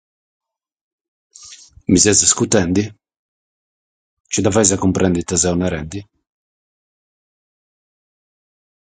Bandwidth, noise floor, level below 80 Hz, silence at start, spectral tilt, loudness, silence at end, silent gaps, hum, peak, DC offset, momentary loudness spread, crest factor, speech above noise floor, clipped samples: 9.6 kHz; -42 dBFS; -40 dBFS; 1.4 s; -3.5 dB/octave; -15 LUFS; 2.8 s; 3.19-4.24 s; none; 0 dBFS; under 0.1%; 16 LU; 20 dB; 26 dB; under 0.1%